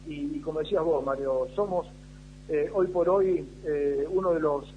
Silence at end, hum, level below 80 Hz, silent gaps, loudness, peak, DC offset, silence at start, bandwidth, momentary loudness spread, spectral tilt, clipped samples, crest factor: 0 s; 50 Hz at -50 dBFS; -50 dBFS; none; -28 LUFS; -12 dBFS; under 0.1%; 0 s; 10 kHz; 9 LU; -7.5 dB/octave; under 0.1%; 16 dB